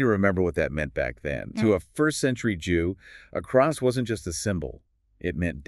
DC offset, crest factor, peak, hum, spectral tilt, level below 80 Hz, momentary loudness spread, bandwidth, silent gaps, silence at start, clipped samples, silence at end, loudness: under 0.1%; 18 dB; -8 dBFS; none; -6 dB/octave; -44 dBFS; 10 LU; 13.5 kHz; none; 0 s; under 0.1%; 0.05 s; -26 LUFS